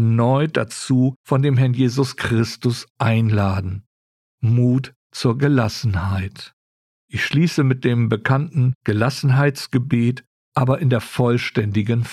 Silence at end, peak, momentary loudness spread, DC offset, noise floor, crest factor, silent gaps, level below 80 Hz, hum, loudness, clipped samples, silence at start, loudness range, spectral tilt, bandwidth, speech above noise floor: 0 s; -4 dBFS; 8 LU; under 0.1%; under -90 dBFS; 14 dB; 1.16-1.24 s, 2.90-2.95 s, 3.86-4.38 s, 4.96-5.10 s, 6.53-7.08 s, 8.75-8.81 s, 10.27-10.52 s; -50 dBFS; none; -19 LUFS; under 0.1%; 0 s; 2 LU; -7 dB/octave; 13 kHz; over 72 dB